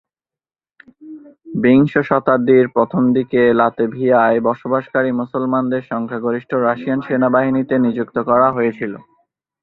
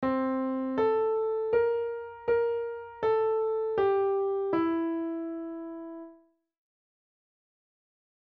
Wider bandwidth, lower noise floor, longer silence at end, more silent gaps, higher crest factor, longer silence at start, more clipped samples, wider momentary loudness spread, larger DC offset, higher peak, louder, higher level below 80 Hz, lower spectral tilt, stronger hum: second, 4.2 kHz vs 4.8 kHz; first, under -90 dBFS vs -59 dBFS; second, 0.6 s vs 2.1 s; neither; about the same, 16 dB vs 14 dB; first, 1 s vs 0 s; neither; second, 8 LU vs 11 LU; neither; first, 0 dBFS vs -16 dBFS; first, -16 LUFS vs -29 LUFS; first, -56 dBFS vs -66 dBFS; first, -10 dB/octave vs -5 dB/octave; neither